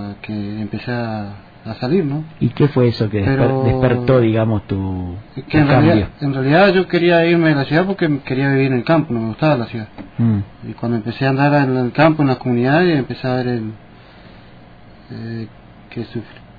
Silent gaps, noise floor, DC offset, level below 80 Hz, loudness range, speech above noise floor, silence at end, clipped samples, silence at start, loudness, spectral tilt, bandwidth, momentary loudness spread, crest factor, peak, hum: none; -41 dBFS; under 0.1%; -42 dBFS; 6 LU; 25 dB; 0.2 s; under 0.1%; 0 s; -16 LUFS; -10 dB/octave; 5 kHz; 16 LU; 14 dB; -2 dBFS; none